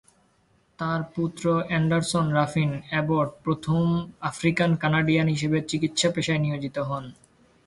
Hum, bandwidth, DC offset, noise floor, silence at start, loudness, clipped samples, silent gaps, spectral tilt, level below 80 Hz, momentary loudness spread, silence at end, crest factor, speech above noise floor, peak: none; 11.5 kHz; under 0.1%; -64 dBFS; 0.8 s; -25 LUFS; under 0.1%; none; -5.5 dB/octave; -56 dBFS; 7 LU; 0.55 s; 18 dB; 40 dB; -8 dBFS